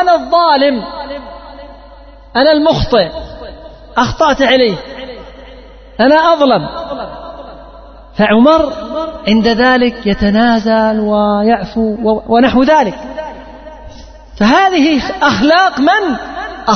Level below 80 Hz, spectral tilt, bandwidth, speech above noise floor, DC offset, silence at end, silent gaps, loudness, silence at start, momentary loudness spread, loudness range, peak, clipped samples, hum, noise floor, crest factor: -34 dBFS; -5.5 dB/octave; 6.6 kHz; 25 dB; under 0.1%; 0 s; none; -11 LUFS; 0 s; 20 LU; 4 LU; 0 dBFS; under 0.1%; none; -36 dBFS; 12 dB